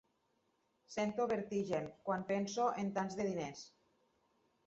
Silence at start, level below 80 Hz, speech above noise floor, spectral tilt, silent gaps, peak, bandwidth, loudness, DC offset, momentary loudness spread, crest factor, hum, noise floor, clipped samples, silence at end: 0.9 s; -76 dBFS; 41 dB; -5 dB/octave; none; -22 dBFS; 8 kHz; -39 LUFS; under 0.1%; 10 LU; 18 dB; none; -79 dBFS; under 0.1%; 1 s